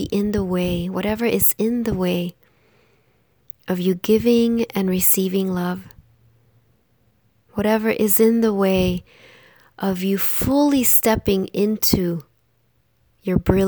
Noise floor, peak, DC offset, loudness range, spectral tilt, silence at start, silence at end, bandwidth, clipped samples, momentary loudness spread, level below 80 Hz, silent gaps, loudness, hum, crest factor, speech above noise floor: -64 dBFS; 0 dBFS; under 0.1%; 4 LU; -5 dB/octave; 0 s; 0 s; over 20 kHz; under 0.1%; 12 LU; -42 dBFS; none; -19 LUFS; none; 20 dB; 45 dB